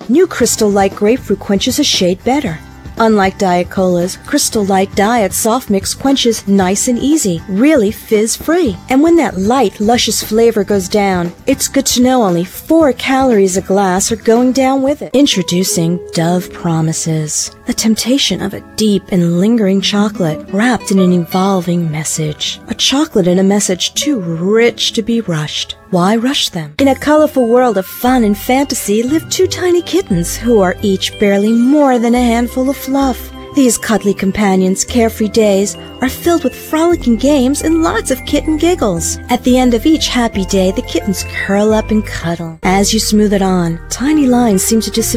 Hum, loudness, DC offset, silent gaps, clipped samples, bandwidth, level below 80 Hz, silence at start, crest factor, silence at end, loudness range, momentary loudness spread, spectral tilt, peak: none; -12 LUFS; under 0.1%; none; under 0.1%; 16 kHz; -34 dBFS; 0 s; 12 dB; 0 s; 2 LU; 6 LU; -4.5 dB/octave; 0 dBFS